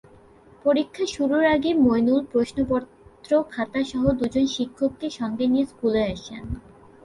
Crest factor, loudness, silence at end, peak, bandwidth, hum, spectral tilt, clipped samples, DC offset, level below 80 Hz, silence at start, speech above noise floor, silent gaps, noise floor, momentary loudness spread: 18 dB; -23 LUFS; 0.45 s; -6 dBFS; 11.5 kHz; none; -6 dB/octave; under 0.1%; under 0.1%; -46 dBFS; 0.65 s; 29 dB; none; -51 dBFS; 9 LU